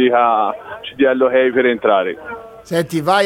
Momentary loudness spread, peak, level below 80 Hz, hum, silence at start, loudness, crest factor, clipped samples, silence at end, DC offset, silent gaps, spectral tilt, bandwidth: 16 LU; -2 dBFS; -56 dBFS; none; 0 s; -16 LUFS; 14 dB; under 0.1%; 0 s; under 0.1%; none; -5.5 dB/octave; 16.5 kHz